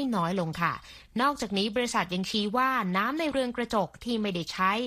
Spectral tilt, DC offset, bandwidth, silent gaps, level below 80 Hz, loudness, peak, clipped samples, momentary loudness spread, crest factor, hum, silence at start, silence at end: -4.5 dB/octave; under 0.1%; 15 kHz; none; -56 dBFS; -28 LUFS; -12 dBFS; under 0.1%; 5 LU; 18 dB; none; 0 s; 0 s